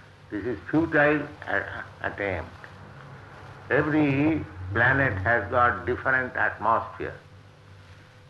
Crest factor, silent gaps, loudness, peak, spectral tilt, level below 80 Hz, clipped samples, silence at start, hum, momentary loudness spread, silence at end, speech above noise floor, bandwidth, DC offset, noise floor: 18 dB; none; -25 LUFS; -8 dBFS; -8 dB/octave; -54 dBFS; under 0.1%; 0.3 s; none; 23 LU; 0.3 s; 25 dB; 7.2 kHz; under 0.1%; -49 dBFS